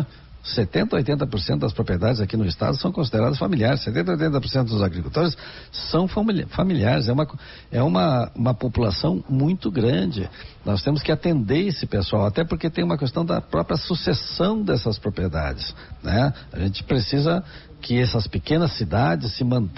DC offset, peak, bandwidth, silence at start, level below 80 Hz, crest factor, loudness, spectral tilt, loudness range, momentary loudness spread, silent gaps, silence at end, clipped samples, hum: under 0.1%; -6 dBFS; 6 kHz; 0 s; -40 dBFS; 16 dB; -23 LUFS; -6 dB/octave; 2 LU; 6 LU; none; 0 s; under 0.1%; none